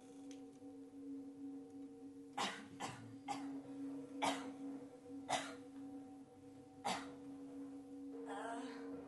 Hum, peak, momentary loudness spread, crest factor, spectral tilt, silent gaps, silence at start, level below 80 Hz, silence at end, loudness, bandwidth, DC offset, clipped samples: none; -26 dBFS; 13 LU; 22 dB; -3.5 dB/octave; none; 0 s; -84 dBFS; 0 s; -48 LUFS; 11.5 kHz; under 0.1%; under 0.1%